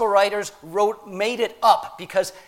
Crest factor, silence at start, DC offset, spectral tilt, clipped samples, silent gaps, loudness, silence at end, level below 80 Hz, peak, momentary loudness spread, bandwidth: 20 dB; 0 s; under 0.1%; -3 dB/octave; under 0.1%; none; -22 LUFS; 0.1 s; -62 dBFS; -2 dBFS; 7 LU; 16.5 kHz